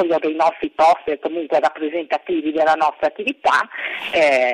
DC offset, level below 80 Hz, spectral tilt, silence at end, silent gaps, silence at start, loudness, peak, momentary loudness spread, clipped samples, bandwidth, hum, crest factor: under 0.1%; -60 dBFS; -3.5 dB/octave; 0 s; none; 0 s; -19 LUFS; -4 dBFS; 8 LU; under 0.1%; 11 kHz; none; 14 dB